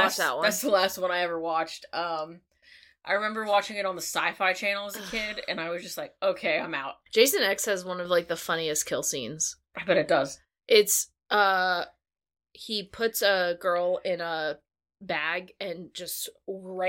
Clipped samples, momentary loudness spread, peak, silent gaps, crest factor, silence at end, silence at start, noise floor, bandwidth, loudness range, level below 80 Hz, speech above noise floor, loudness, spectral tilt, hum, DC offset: under 0.1%; 12 LU; -6 dBFS; none; 22 dB; 0 s; 0 s; -57 dBFS; 17 kHz; 4 LU; -66 dBFS; 29 dB; -27 LUFS; -1.5 dB/octave; none; under 0.1%